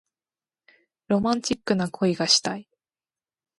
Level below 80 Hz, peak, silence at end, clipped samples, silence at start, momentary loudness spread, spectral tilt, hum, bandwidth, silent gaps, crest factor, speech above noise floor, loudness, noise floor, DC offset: -62 dBFS; -6 dBFS; 0.95 s; under 0.1%; 1.1 s; 8 LU; -3.5 dB/octave; none; 11.5 kHz; none; 22 dB; over 66 dB; -23 LUFS; under -90 dBFS; under 0.1%